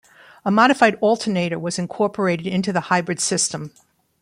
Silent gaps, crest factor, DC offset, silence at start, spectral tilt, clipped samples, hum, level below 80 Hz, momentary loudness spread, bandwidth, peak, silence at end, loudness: none; 20 dB; under 0.1%; 0.45 s; -4 dB/octave; under 0.1%; none; -62 dBFS; 10 LU; 15.5 kHz; -2 dBFS; 0.55 s; -20 LUFS